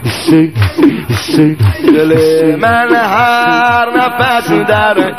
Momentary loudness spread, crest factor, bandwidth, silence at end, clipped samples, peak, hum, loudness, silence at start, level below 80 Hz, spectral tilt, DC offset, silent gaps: 3 LU; 10 dB; 15.5 kHz; 0 s; 0.1%; 0 dBFS; none; -9 LUFS; 0 s; -38 dBFS; -6 dB/octave; 0.8%; none